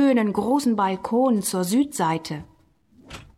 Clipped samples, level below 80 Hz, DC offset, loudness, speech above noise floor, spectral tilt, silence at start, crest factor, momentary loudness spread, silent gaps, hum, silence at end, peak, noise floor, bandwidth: under 0.1%; -56 dBFS; under 0.1%; -22 LUFS; 35 dB; -5 dB/octave; 0 s; 12 dB; 14 LU; none; none; 0.15 s; -10 dBFS; -57 dBFS; 17 kHz